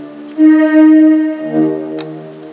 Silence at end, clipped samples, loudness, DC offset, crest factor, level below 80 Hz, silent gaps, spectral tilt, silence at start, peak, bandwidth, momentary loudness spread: 0 s; under 0.1%; -9 LUFS; under 0.1%; 10 dB; -66 dBFS; none; -11 dB/octave; 0 s; 0 dBFS; 4 kHz; 19 LU